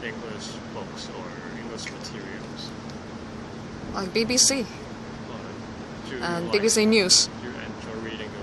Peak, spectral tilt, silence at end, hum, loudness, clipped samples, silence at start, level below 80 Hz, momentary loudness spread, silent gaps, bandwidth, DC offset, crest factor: -4 dBFS; -2.5 dB/octave; 0 s; none; -24 LUFS; under 0.1%; 0 s; -52 dBFS; 19 LU; none; 12 kHz; under 0.1%; 22 dB